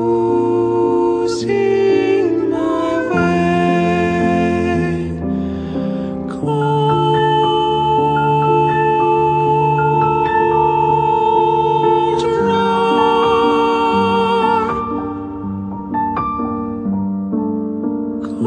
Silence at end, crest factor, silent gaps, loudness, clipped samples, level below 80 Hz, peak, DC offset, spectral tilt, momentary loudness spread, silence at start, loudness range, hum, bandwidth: 0 s; 12 dB; none; -16 LUFS; under 0.1%; -42 dBFS; -2 dBFS; under 0.1%; -7 dB/octave; 8 LU; 0 s; 4 LU; none; 9.4 kHz